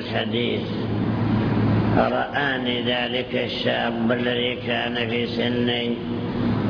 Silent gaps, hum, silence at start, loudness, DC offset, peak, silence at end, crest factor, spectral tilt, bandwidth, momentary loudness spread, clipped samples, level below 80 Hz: none; none; 0 s; -23 LUFS; under 0.1%; -6 dBFS; 0 s; 16 dB; -8 dB/octave; 5.4 kHz; 4 LU; under 0.1%; -44 dBFS